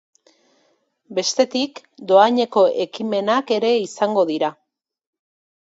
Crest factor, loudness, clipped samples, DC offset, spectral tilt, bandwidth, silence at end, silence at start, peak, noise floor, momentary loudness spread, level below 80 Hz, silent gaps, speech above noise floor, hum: 20 dB; -19 LUFS; under 0.1%; under 0.1%; -3.5 dB/octave; 8 kHz; 1.1 s; 1.1 s; 0 dBFS; -64 dBFS; 10 LU; -74 dBFS; none; 46 dB; none